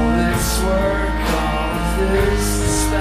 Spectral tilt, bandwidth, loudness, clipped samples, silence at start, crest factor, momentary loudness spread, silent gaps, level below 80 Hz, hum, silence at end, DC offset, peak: -4.5 dB/octave; 15.5 kHz; -18 LUFS; under 0.1%; 0 s; 12 dB; 3 LU; none; -22 dBFS; none; 0 s; under 0.1%; -6 dBFS